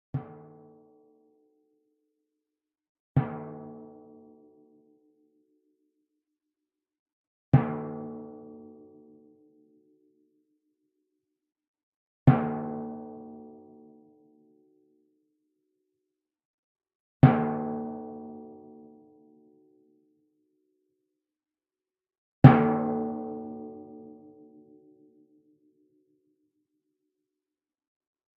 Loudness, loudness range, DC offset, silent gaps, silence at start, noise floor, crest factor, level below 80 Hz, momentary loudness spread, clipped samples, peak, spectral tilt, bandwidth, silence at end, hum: -25 LUFS; 20 LU; under 0.1%; 2.89-3.15 s, 6.99-7.06 s, 7.13-7.52 s, 11.68-11.74 s, 11.83-12.26 s, 16.45-16.75 s, 16.95-17.20 s, 22.18-22.42 s; 0.15 s; under -90 dBFS; 32 dB; -60 dBFS; 27 LU; under 0.1%; 0 dBFS; -9 dB/octave; 4.4 kHz; 4.25 s; none